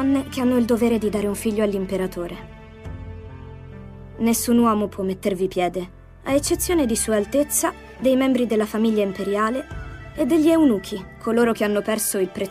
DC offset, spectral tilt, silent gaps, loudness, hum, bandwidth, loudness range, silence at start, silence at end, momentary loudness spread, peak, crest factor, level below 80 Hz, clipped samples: under 0.1%; -4.5 dB/octave; none; -21 LUFS; none; 16 kHz; 4 LU; 0 s; 0 s; 20 LU; -6 dBFS; 16 dB; -44 dBFS; under 0.1%